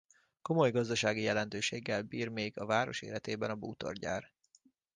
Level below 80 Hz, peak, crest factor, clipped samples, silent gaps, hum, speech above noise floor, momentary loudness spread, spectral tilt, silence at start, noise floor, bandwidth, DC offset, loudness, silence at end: -68 dBFS; -16 dBFS; 20 dB; under 0.1%; none; none; 35 dB; 10 LU; -4.5 dB/octave; 0.45 s; -70 dBFS; 10 kHz; under 0.1%; -35 LUFS; 0.7 s